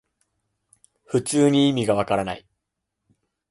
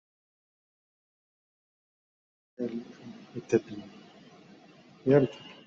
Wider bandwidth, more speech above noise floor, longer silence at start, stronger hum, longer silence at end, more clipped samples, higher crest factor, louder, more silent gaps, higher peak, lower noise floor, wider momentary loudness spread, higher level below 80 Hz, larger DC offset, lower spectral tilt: first, 11.5 kHz vs 7.6 kHz; first, 60 dB vs 27 dB; second, 1.1 s vs 2.6 s; neither; first, 1.1 s vs 0.15 s; neither; second, 18 dB vs 24 dB; first, -21 LUFS vs -29 LUFS; neither; first, -6 dBFS vs -10 dBFS; first, -81 dBFS vs -55 dBFS; second, 11 LU vs 22 LU; first, -56 dBFS vs -72 dBFS; neither; second, -5.5 dB/octave vs -7 dB/octave